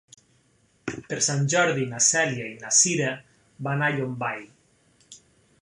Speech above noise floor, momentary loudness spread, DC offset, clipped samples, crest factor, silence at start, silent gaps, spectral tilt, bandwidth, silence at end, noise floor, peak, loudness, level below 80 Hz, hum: 40 dB; 17 LU; under 0.1%; under 0.1%; 22 dB; 0.85 s; none; -3 dB/octave; 11.5 kHz; 0.45 s; -64 dBFS; -6 dBFS; -23 LUFS; -66 dBFS; none